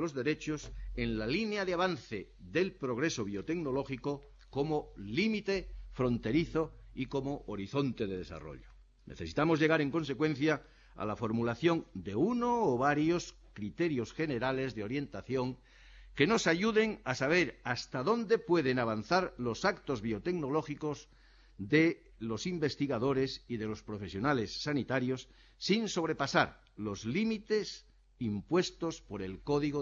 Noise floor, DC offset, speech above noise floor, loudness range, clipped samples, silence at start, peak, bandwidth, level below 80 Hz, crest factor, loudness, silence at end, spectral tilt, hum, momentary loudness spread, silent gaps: -55 dBFS; under 0.1%; 22 dB; 4 LU; under 0.1%; 0 s; -14 dBFS; 7.8 kHz; -56 dBFS; 20 dB; -33 LUFS; 0 s; -5.5 dB/octave; none; 12 LU; none